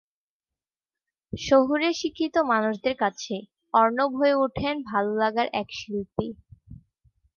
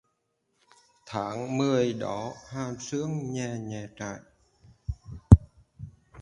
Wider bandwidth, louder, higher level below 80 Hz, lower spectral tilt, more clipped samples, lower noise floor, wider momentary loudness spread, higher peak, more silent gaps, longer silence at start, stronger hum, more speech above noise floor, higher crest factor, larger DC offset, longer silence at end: second, 7.2 kHz vs 10.5 kHz; about the same, -25 LUFS vs -27 LUFS; second, -56 dBFS vs -36 dBFS; second, -5 dB/octave vs -7 dB/octave; neither; first, under -90 dBFS vs -76 dBFS; second, 12 LU vs 24 LU; second, -6 dBFS vs 0 dBFS; neither; first, 1.35 s vs 1.05 s; neither; first, over 66 dB vs 45 dB; second, 20 dB vs 28 dB; neither; first, 0.6 s vs 0 s